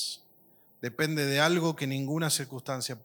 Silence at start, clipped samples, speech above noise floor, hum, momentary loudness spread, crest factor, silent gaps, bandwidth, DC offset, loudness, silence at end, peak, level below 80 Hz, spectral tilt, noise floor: 0 s; under 0.1%; 32 dB; none; 13 LU; 20 dB; none; 19 kHz; under 0.1%; -29 LUFS; 0.05 s; -10 dBFS; -76 dBFS; -4 dB/octave; -61 dBFS